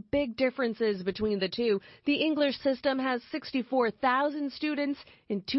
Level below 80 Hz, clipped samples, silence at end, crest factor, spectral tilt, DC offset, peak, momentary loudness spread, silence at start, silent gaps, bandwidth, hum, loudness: -60 dBFS; under 0.1%; 0 s; 16 dB; -8.5 dB/octave; under 0.1%; -14 dBFS; 7 LU; 0.15 s; none; 5.8 kHz; none; -29 LUFS